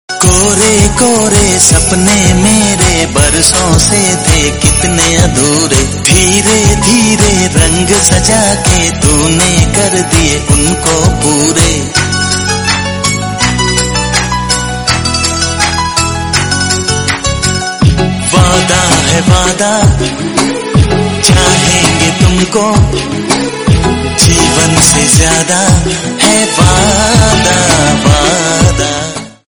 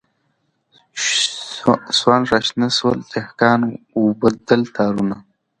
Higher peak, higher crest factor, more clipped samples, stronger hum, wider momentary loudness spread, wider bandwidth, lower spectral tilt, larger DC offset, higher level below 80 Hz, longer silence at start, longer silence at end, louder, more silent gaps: about the same, 0 dBFS vs 0 dBFS; second, 8 dB vs 18 dB; first, 1% vs under 0.1%; neither; second, 5 LU vs 8 LU; first, over 20 kHz vs 9.6 kHz; about the same, -3.5 dB/octave vs -4 dB/octave; first, 0.3% vs under 0.1%; first, -20 dBFS vs -54 dBFS; second, 0.1 s vs 0.95 s; second, 0.2 s vs 0.4 s; first, -8 LUFS vs -18 LUFS; neither